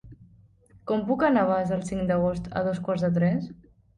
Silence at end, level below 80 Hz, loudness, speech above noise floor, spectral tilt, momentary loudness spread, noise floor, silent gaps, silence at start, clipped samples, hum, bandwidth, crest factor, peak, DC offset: 0.45 s; -52 dBFS; -26 LUFS; 31 dB; -8 dB/octave; 8 LU; -56 dBFS; none; 0.05 s; under 0.1%; none; 9.8 kHz; 16 dB; -10 dBFS; under 0.1%